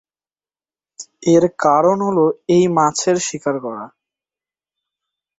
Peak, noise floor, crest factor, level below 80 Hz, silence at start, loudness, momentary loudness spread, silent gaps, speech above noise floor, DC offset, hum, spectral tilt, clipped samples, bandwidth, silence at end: -2 dBFS; under -90 dBFS; 16 dB; -62 dBFS; 1 s; -16 LUFS; 15 LU; none; over 74 dB; under 0.1%; none; -5 dB/octave; under 0.1%; 8 kHz; 1.5 s